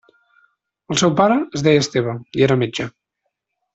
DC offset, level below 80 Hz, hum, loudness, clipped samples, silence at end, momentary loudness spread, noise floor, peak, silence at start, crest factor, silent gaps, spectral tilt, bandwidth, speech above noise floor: under 0.1%; -54 dBFS; none; -18 LUFS; under 0.1%; 0.85 s; 9 LU; -76 dBFS; -2 dBFS; 0.9 s; 18 dB; none; -5 dB/octave; 8.4 kHz; 59 dB